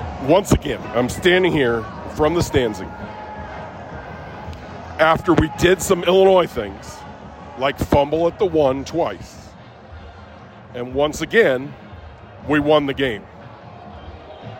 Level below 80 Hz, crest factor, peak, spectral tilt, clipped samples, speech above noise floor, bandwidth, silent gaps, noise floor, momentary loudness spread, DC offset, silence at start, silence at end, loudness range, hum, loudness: -38 dBFS; 18 dB; -2 dBFS; -5.5 dB/octave; under 0.1%; 23 dB; 16.5 kHz; none; -41 dBFS; 23 LU; under 0.1%; 0 s; 0 s; 5 LU; none; -18 LUFS